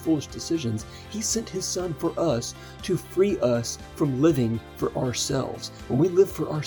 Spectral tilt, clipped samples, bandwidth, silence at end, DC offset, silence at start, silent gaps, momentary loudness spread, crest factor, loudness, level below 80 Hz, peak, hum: -5 dB/octave; under 0.1%; over 20 kHz; 0 s; under 0.1%; 0 s; none; 11 LU; 18 dB; -26 LUFS; -50 dBFS; -8 dBFS; none